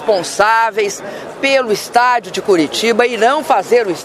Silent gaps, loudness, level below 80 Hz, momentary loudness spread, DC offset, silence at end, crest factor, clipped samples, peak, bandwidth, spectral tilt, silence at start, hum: none; -13 LUFS; -58 dBFS; 6 LU; under 0.1%; 0 s; 14 dB; under 0.1%; 0 dBFS; 15.5 kHz; -3 dB/octave; 0 s; none